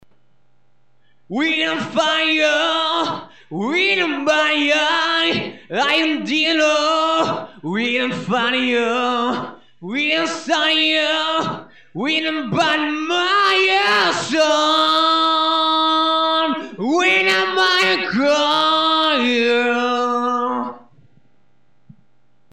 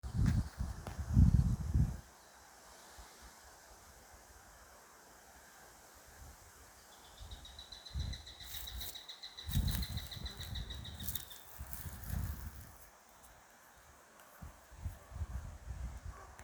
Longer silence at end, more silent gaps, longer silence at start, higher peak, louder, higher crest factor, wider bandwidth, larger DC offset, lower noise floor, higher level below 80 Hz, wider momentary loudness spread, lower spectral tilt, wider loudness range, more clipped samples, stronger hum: first, 1.75 s vs 0 s; neither; first, 1.3 s vs 0.05 s; first, -6 dBFS vs -14 dBFS; first, -17 LUFS vs -40 LUFS; second, 12 dB vs 26 dB; second, 13.5 kHz vs over 20 kHz; first, 0.3% vs under 0.1%; about the same, -64 dBFS vs -61 dBFS; second, -68 dBFS vs -44 dBFS; second, 9 LU vs 23 LU; second, -3 dB/octave vs -5.5 dB/octave; second, 4 LU vs 20 LU; neither; neither